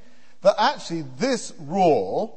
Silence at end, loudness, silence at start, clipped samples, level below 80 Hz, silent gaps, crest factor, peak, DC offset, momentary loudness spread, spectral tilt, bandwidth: 0.1 s; -22 LUFS; 0.45 s; under 0.1%; -64 dBFS; none; 18 dB; -4 dBFS; 1%; 10 LU; -4.5 dB/octave; 8.8 kHz